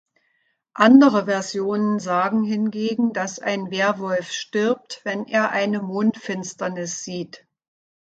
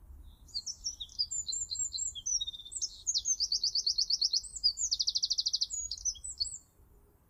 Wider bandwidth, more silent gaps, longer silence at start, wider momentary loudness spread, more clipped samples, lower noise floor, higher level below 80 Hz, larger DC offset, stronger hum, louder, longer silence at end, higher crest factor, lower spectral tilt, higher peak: second, 8 kHz vs 16.5 kHz; neither; first, 0.75 s vs 0 s; first, 13 LU vs 9 LU; neither; first, -69 dBFS vs -62 dBFS; second, -70 dBFS vs -58 dBFS; neither; neither; first, -21 LUFS vs -31 LUFS; about the same, 0.65 s vs 0.7 s; about the same, 22 dB vs 18 dB; first, -5 dB/octave vs 2 dB/octave; first, 0 dBFS vs -16 dBFS